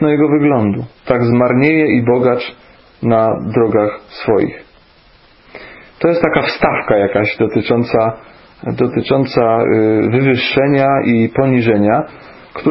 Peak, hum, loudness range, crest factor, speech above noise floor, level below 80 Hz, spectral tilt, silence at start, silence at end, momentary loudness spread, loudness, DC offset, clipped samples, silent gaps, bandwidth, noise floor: 0 dBFS; none; 5 LU; 14 dB; 34 dB; -46 dBFS; -11 dB/octave; 0 s; 0 s; 9 LU; -13 LUFS; under 0.1%; under 0.1%; none; 5.8 kHz; -47 dBFS